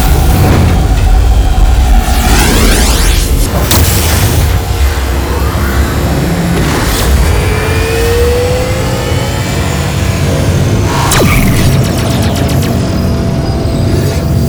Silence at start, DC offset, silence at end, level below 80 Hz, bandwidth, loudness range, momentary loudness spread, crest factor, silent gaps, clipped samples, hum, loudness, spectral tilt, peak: 0 s; under 0.1%; 0 s; -12 dBFS; over 20 kHz; 2 LU; 5 LU; 8 dB; none; 0.4%; none; -10 LUFS; -5 dB/octave; 0 dBFS